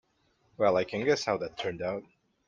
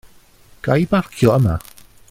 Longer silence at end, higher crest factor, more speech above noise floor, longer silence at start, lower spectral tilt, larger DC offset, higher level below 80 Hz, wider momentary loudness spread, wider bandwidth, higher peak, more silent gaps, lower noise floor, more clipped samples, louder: about the same, 0.45 s vs 0.5 s; about the same, 20 dB vs 18 dB; first, 42 dB vs 32 dB; about the same, 0.6 s vs 0.65 s; second, -4.5 dB/octave vs -7.5 dB/octave; neither; second, -66 dBFS vs -40 dBFS; about the same, 9 LU vs 11 LU; second, 9.2 kHz vs 16 kHz; second, -12 dBFS vs 0 dBFS; neither; first, -71 dBFS vs -48 dBFS; neither; second, -30 LUFS vs -18 LUFS